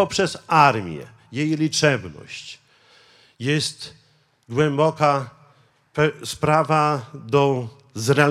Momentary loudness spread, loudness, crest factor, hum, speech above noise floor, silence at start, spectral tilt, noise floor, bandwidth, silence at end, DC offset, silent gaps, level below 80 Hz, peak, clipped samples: 17 LU; -21 LUFS; 22 dB; none; 37 dB; 0 s; -5 dB/octave; -57 dBFS; 14.5 kHz; 0 s; under 0.1%; none; -58 dBFS; 0 dBFS; under 0.1%